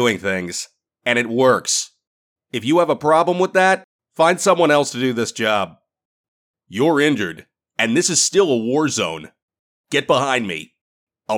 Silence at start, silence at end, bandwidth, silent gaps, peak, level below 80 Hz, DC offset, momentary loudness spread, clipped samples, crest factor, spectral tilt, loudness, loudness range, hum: 0 s; 0 s; 19 kHz; 2.07-2.36 s, 3.84-3.99 s, 6.05-6.54 s, 9.42-9.48 s, 9.59-9.84 s, 10.81-11.07 s; -4 dBFS; -64 dBFS; under 0.1%; 13 LU; under 0.1%; 16 dB; -3.5 dB/octave; -18 LUFS; 3 LU; none